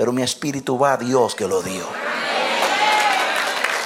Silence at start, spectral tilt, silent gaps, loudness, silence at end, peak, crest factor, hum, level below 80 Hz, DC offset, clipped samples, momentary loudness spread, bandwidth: 0 s; -3 dB/octave; none; -19 LUFS; 0 s; -2 dBFS; 16 dB; none; -64 dBFS; under 0.1%; under 0.1%; 8 LU; 17 kHz